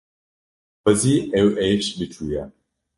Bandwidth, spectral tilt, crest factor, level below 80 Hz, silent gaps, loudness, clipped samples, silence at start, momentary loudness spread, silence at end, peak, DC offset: 12 kHz; -5 dB/octave; 20 dB; -48 dBFS; none; -21 LUFS; under 0.1%; 0.85 s; 12 LU; 0.5 s; -2 dBFS; under 0.1%